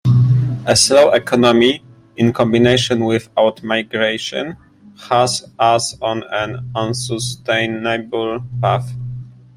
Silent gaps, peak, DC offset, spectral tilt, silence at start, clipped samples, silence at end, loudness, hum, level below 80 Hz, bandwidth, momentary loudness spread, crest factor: none; 0 dBFS; under 0.1%; -4.5 dB/octave; 0.05 s; under 0.1%; 0.25 s; -16 LUFS; none; -48 dBFS; 16 kHz; 11 LU; 16 dB